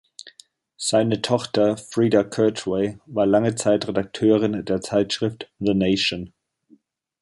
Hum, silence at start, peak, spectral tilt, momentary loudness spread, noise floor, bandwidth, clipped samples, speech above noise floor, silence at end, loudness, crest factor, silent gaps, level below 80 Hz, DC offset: none; 0.25 s; -4 dBFS; -5 dB/octave; 8 LU; -58 dBFS; 11.5 kHz; under 0.1%; 37 dB; 0.95 s; -21 LUFS; 18 dB; none; -54 dBFS; under 0.1%